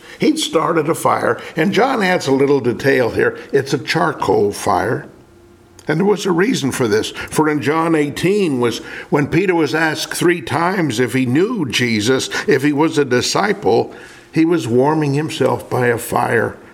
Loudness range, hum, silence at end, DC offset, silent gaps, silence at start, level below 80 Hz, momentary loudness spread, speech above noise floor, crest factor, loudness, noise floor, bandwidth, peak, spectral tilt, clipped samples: 2 LU; none; 0.1 s; under 0.1%; none; 0.05 s; -52 dBFS; 4 LU; 30 dB; 16 dB; -16 LUFS; -45 dBFS; 17 kHz; 0 dBFS; -5 dB/octave; under 0.1%